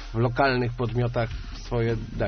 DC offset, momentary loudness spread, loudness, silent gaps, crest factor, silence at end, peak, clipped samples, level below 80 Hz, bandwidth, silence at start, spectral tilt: under 0.1%; 9 LU; -26 LUFS; none; 18 dB; 0 s; -8 dBFS; under 0.1%; -38 dBFS; 6.4 kHz; 0 s; -6 dB/octave